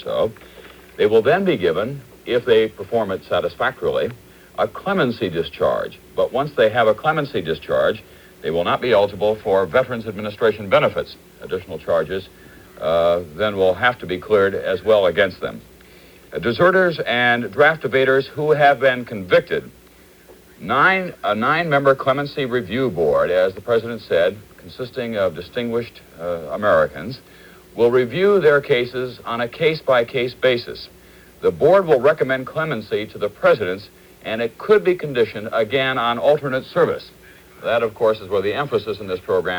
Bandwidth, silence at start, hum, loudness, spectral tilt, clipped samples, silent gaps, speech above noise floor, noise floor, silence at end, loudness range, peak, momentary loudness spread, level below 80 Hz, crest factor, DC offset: over 20 kHz; 0 s; none; -19 LUFS; -6.5 dB/octave; under 0.1%; none; 29 dB; -48 dBFS; 0 s; 4 LU; 0 dBFS; 12 LU; -52 dBFS; 18 dB; under 0.1%